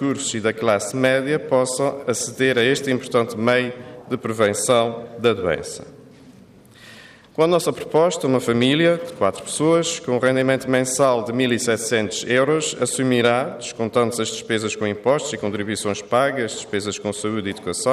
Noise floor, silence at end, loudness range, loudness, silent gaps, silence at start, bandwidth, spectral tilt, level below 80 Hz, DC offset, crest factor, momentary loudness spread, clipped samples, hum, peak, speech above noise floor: -47 dBFS; 0 s; 4 LU; -20 LUFS; none; 0 s; 15 kHz; -4 dB/octave; -62 dBFS; under 0.1%; 16 dB; 8 LU; under 0.1%; none; -4 dBFS; 27 dB